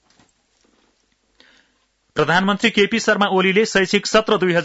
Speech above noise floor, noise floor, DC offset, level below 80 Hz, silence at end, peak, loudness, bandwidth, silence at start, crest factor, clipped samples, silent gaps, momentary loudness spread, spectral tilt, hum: 48 dB; -64 dBFS; under 0.1%; -56 dBFS; 0 s; -4 dBFS; -17 LUFS; 8 kHz; 2.15 s; 16 dB; under 0.1%; none; 2 LU; -4 dB/octave; none